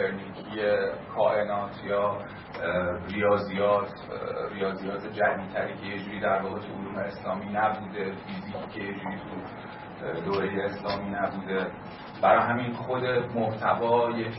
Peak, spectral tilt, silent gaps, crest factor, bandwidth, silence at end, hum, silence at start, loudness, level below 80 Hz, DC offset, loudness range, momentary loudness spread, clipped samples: -8 dBFS; -10 dB/octave; none; 22 dB; 5.8 kHz; 0 s; none; 0 s; -29 LUFS; -60 dBFS; under 0.1%; 5 LU; 12 LU; under 0.1%